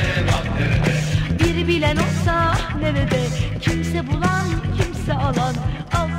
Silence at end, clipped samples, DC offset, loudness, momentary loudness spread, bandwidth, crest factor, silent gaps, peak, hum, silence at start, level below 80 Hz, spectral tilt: 0 s; under 0.1%; under 0.1%; -20 LUFS; 4 LU; 15.5 kHz; 16 dB; none; -4 dBFS; none; 0 s; -30 dBFS; -6 dB/octave